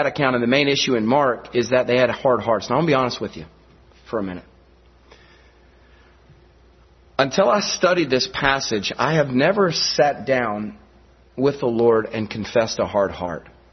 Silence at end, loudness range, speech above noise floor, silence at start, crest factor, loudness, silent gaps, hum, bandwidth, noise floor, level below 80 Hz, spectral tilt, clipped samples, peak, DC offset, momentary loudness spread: 0.25 s; 15 LU; 32 dB; 0 s; 20 dB; -20 LUFS; none; none; 6.4 kHz; -52 dBFS; -52 dBFS; -4.5 dB/octave; under 0.1%; 0 dBFS; under 0.1%; 12 LU